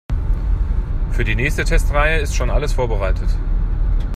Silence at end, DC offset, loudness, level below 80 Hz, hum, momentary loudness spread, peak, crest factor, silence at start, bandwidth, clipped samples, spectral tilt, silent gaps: 0 s; under 0.1%; -20 LUFS; -18 dBFS; none; 6 LU; -2 dBFS; 14 dB; 0.1 s; 12.5 kHz; under 0.1%; -5.5 dB/octave; none